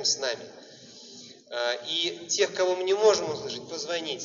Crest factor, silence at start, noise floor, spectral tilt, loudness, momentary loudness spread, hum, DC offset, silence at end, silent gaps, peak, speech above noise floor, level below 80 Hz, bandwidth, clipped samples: 20 dB; 0 s; -48 dBFS; -0.5 dB/octave; -27 LUFS; 23 LU; none; under 0.1%; 0 s; none; -8 dBFS; 20 dB; -76 dBFS; 7.6 kHz; under 0.1%